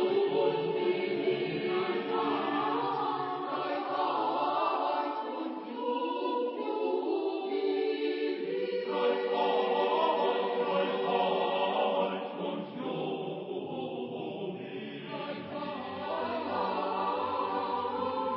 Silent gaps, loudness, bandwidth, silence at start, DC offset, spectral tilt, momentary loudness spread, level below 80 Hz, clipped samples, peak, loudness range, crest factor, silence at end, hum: none; -32 LUFS; 5.6 kHz; 0 s; under 0.1%; -3 dB/octave; 9 LU; -76 dBFS; under 0.1%; -16 dBFS; 7 LU; 16 dB; 0 s; none